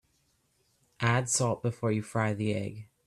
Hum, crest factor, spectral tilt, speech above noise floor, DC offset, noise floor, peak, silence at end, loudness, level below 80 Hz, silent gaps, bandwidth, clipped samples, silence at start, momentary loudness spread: none; 22 dB; -5 dB/octave; 43 dB; under 0.1%; -72 dBFS; -10 dBFS; 0.25 s; -30 LUFS; -66 dBFS; none; 13 kHz; under 0.1%; 1 s; 6 LU